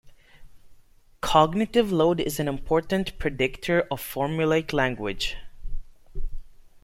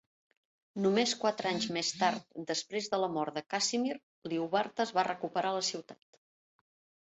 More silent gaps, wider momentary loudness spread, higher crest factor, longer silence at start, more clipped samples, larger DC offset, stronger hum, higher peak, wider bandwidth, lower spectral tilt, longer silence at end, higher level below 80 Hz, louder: second, none vs 4.03-4.22 s; first, 21 LU vs 7 LU; about the same, 22 dB vs 20 dB; second, 0.05 s vs 0.75 s; neither; neither; neither; first, -4 dBFS vs -14 dBFS; first, 16.5 kHz vs 8.2 kHz; first, -5.5 dB/octave vs -3 dB/octave; second, 0.3 s vs 1.1 s; first, -38 dBFS vs -78 dBFS; first, -25 LUFS vs -33 LUFS